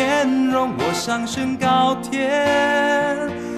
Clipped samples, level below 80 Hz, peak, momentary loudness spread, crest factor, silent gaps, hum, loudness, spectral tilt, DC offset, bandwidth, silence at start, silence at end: under 0.1%; -56 dBFS; -6 dBFS; 5 LU; 14 dB; none; none; -19 LUFS; -4 dB/octave; under 0.1%; 14 kHz; 0 s; 0 s